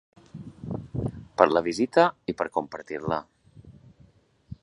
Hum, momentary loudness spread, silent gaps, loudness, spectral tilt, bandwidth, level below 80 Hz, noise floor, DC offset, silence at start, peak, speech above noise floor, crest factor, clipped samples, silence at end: none; 22 LU; none; -26 LUFS; -6 dB/octave; 11 kHz; -54 dBFS; -59 dBFS; under 0.1%; 0.35 s; 0 dBFS; 34 dB; 28 dB; under 0.1%; 0.1 s